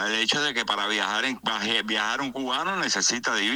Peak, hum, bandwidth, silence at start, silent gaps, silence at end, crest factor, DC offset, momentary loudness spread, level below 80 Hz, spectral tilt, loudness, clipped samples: -8 dBFS; none; over 20 kHz; 0 s; none; 0 s; 18 dB; under 0.1%; 5 LU; -64 dBFS; -1 dB/octave; -24 LUFS; under 0.1%